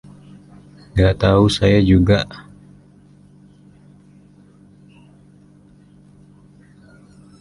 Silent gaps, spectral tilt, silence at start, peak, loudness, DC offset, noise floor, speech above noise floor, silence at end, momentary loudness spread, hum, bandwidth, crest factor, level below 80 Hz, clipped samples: none; -7 dB/octave; 0.95 s; -2 dBFS; -15 LUFS; under 0.1%; -48 dBFS; 34 dB; 5 s; 13 LU; none; 11.5 kHz; 20 dB; -34 dBFS; under 0.1%